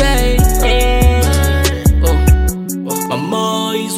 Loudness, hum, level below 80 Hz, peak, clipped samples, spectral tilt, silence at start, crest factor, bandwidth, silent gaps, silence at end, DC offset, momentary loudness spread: -14 LUFS; none; -14 dBFS; 0 dBFS; under 0.1%; -5 dB/octave; 0 s; 12 dB; 16 kHz; none; 0 s; under 0.1%; 6 LU